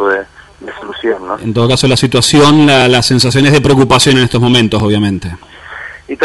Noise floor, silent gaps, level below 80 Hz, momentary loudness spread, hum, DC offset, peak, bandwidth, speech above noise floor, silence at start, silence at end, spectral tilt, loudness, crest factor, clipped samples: -29 dBFS; none; -36 dBFS; 20 LU; none; under 0.1%; 0 dBFS; 12.5 kHz; 20 dB; 0 s; 0 s; -5 dB/octave; -9 LUFS; 10 dB; under 0.1%